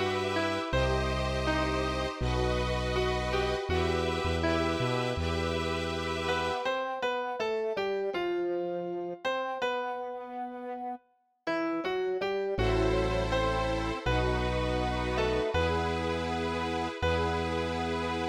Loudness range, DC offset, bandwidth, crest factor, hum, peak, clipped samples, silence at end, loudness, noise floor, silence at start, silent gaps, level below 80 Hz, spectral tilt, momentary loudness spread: 4 LU; under 0.1%; 15 kHz; 16 dB; none; -16 dBFS; under 0.1%; 0 s; -31 LUFS; -66 dBFS; 0 s; none; -40 dBFS; -5.5 dB/octave; 5 LU